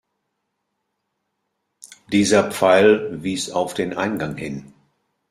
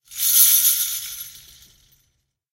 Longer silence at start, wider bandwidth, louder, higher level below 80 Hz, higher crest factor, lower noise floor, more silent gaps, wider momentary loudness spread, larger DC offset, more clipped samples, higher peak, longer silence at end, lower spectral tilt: first, 1.85 s vs 0.1 s; about the same, 15 kHz vs 16.5 kHz; second, -19 LUFS vs -15 LUFS; about the same, -58 dBFS vs -62 dBFS; about the same, 20 dB vs 22 dB; first, -76 dBFS vs -70 dBFS; neither; second, 14 LU vs 22 LU; neither; neither; about the same, -2 dBFS vs 0 dBFS; second, 0.65 s vs 1.2 s; first, -4.5 dB/octave vs 5 dB/octave